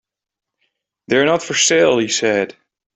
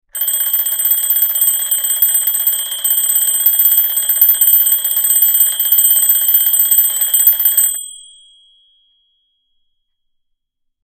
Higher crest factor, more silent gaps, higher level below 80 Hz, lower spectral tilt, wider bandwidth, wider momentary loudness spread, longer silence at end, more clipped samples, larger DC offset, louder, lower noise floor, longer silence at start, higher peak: about the same, 18 dB vs 14 dB; neither; second, -60 dBFS vs -54 dBFS; first, -2.5 dB/octave vs 4.5 dB/octave; second, 8.4 kHz vs over 20 kHz; about the same, 7 LU vs 6 LU; second, 0.45 s vs 2.8 s; neither; neither; second, -15 LUFS vs -10 LUFS; first, -85 dBFS vs -69 dBFS; first, 1.1 s vs 0.15 s; about the same, -2 dBFS vs 0 dBFS